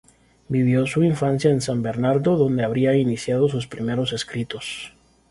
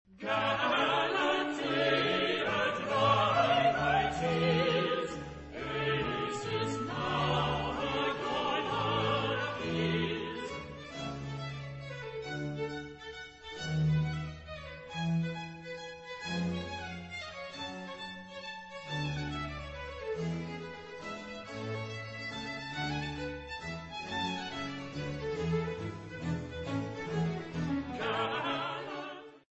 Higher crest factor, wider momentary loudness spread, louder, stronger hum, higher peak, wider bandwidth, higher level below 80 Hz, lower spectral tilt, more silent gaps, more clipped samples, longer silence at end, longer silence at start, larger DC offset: about the same, 16 dB vs 20 dB; second, 10 LU vs 14 LU; first, -21 LUFS vs -34 LUFS; neither; first, -6 dBFS vs -14 dBFS; first, 11.5 kHz vs 8.2 kHz; about the same, -54 dBFS vs -56 dBFS; about the same, -6.5 dB/octave vs -5.5 dB/octave; neither; neither; first, 0.45 s vs 0.2 s; first, 0.5 s vs 0.1 s; neither